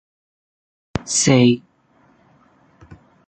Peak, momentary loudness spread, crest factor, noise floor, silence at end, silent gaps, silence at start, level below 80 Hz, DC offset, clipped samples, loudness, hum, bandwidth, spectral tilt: -2 dBFS; 16 LU; 20 dB; -57 dBFS; 0.35 s; none; 0.95 s; -48 dBFS; under 0.1%; under 0.1%; -17 LUFS; none; 9.4 kHz; -4.5 dB/octave